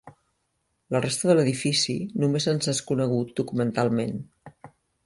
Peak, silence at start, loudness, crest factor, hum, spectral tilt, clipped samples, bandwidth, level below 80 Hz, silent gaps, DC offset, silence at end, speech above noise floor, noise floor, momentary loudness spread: -6 dBFS; 0.05 s; -25 LUFS; 20 dB; none; -5 dB/octave; under 0.1%; 11.5 kHz; -62 dBFS; none; under 0.1%; 0.4 s; 50 dB; -75 dBFS; 7 LU